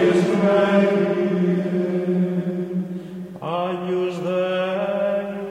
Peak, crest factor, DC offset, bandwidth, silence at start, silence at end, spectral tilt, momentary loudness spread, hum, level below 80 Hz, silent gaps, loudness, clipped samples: -4 dBFS; 16 dB; under 0.1%; 10 kHz; 0 s; 0 s; -7.5 dB/octave; 10 LU; none; -64 dBFS; none; -21 LUFS; under 0.1%